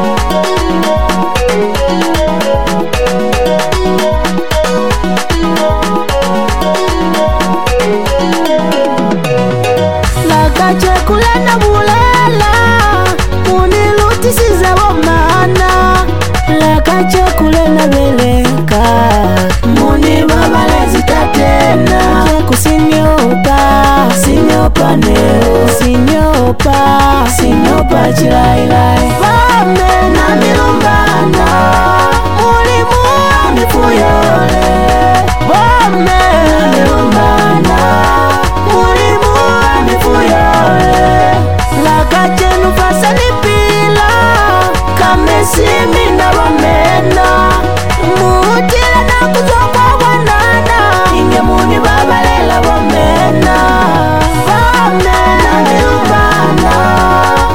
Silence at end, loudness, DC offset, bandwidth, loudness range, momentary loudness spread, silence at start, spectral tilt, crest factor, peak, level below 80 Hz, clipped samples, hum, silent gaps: 0 s; -8 LUFS; 10%; 17.5 kHz; 3 LU; 4 LU; 0 s; -5 dB/octave; 8 dB; 0 dBFS; -18 dBFS; under 0.1%; none; none